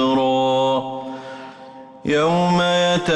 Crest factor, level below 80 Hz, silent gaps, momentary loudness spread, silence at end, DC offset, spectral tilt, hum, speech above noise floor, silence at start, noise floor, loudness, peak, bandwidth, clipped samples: 10 dB; -54 dBFS; none; 19 LU; 0 s; under 0.1%; -5.5 dB/octave; none; 23 dB; 0 s; -40 dBFS; -18 LUFS; -8 dBFS; 11.5 kHz; under 0.1%